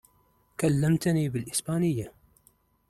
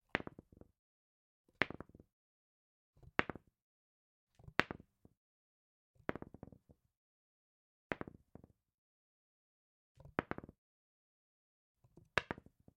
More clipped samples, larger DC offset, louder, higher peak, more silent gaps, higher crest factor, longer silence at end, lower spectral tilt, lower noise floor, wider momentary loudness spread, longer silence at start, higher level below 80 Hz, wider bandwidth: neither; neither; first, -27 LUFS vs -43 LUFS; second, -12 dBFS vs -8 dBFS; second, none vs 0.79-1.44 s, 2.13-2.93 s, 3.62-4.27 s, 5.17-5.94 s, 6.97-7.90 s, 8.74-9.95 s, 10.58-11.75 s; second, 16 dB vs 42 dB; first, 0.8 s vs 0.4 s; about the same, -6 dB/octave vs -5 dB/octave; about the same, -66 dBFS vs -66 dBFS; second, 12 LU vs 24 LU; first, 0.6 s vs 0.15 s; first, -56 dBFS vs -70 dBFS; first, 15 kHz vs 9.4 kHz